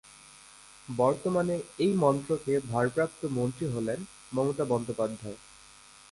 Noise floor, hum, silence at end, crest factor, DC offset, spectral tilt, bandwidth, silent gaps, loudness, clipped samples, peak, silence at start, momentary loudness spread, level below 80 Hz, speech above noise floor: -54 dBFS; none; 0.75 s; 20 dB; under 0.1%; -6.5 dB/octave; 11.5 kHz; none; -30 LUFS; under 0.1%; -12 dBFS; 0.1 s; 22 LU; -62 dBFS; 25 dB